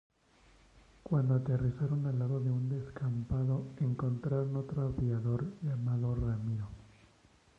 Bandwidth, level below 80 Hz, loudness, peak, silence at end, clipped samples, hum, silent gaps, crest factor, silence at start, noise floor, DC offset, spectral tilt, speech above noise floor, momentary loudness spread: 5 kHz; -52 dBFS; -34 LUFS; -20 dBFS; 0.7 s; under 0.1%; none; none; 14 dB; 1.05 s; -65 dBFS; under 0.1%; -10.5 dB/octave; 32 dB; 6 LU